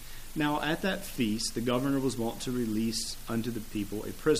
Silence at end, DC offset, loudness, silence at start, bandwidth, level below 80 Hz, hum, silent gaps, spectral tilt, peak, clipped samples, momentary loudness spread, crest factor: 0 s; under 0.1%; -32 LUFS; 0 s; 15.5 kHz; -44 dBFS; none; none; -4.5 dB/octave; -14 dBFS; under 0.1%; 6 LU; 18 dB